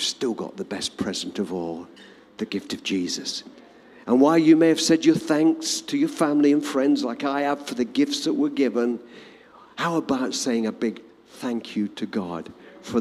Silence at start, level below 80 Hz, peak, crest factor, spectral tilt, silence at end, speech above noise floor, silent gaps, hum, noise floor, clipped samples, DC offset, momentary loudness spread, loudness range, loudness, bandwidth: 0 s; -66 dBFS; -4 dBFS; 18 dB; -4 dB/octave; 0 s; 26 dB; none; none; -49 dBFS; under 0.1%; under 0.1%; 15 LU; 9 LU; -23 LUFS; 14 kHz